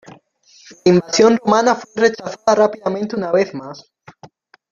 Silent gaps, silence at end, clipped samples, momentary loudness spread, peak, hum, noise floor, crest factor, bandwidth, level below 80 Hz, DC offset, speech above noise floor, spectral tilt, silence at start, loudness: none; 0.45 s; under 0.1%; 10 LU; -2 dBFS; none; -50 dBFS; 16 dB; 7.4 kHz; -60 dBFS; under 0.1%; 35 dB; -5 dB/octave; 0.7 s; -16 LUFS